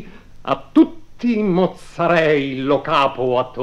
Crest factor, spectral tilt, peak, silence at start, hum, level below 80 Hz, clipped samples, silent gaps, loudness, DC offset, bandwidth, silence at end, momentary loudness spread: 16 dB; -7 dB/octave; -2 dBFS; 0 s; 50 Hz at -50 dBFS; -46 dBFS; under 0.1%; none; -18 LUFS; 0.2%; 10 kHz; 0 s; 9 LU